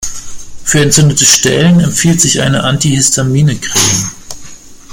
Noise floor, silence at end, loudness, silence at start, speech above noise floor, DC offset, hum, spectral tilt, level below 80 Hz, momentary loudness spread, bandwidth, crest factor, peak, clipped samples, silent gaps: -30 dBFS; 0 s; -9 LUFS; 0 s; 21 dB; under 0.1%; none; -3.5 dB/octave; -34 dBFS; 16 LU; over 20 kHz; 10 dB; 0 dBFS; 0.2%; none